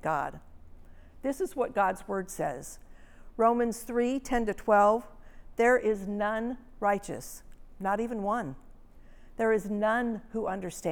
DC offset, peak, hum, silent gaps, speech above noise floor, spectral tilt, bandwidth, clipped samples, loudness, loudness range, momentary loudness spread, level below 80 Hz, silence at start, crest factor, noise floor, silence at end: under 0.1%; -12 dBFS; none; none; 21 dB; -5.5 dB/octave; 20 kHz; under 0.1%; -29 LUFS; 6 LU; 15 LU; -50 dBFS; 0.05 s; 18 dB; -50 dBFS; 0 s